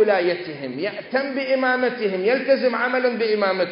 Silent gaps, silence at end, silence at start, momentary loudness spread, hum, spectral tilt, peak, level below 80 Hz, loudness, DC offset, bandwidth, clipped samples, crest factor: none; 0 s; 0 s; 8 LU; none; -9.5 dB/octave; -6 dBFS; -76 dBFS; -21 LUFS; under 0.1%; 5.4 kHz; under 0.1%; 14 dB